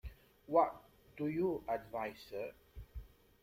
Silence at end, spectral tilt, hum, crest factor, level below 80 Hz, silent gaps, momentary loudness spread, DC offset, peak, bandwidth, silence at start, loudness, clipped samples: 0.35 s; -7.5 dB/octave; none; 22 dB; -58 dBFS; none; 23 LU; under 0.1%; -18 dBFS; 16.5 kHz; 0.05 s; -38 LUFS; under 0.1%